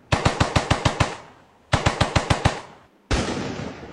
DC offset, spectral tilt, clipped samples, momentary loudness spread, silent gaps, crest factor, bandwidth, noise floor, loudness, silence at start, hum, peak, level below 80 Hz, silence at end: under 0.1%; -4.5 dB/octave; under 0.1%; 10 LU; none; 20 dB; 12 kHz; -50 dBFS; -23 LUFS; 0.1 s; none; -4 dBFS; -34 dBFS; 0 s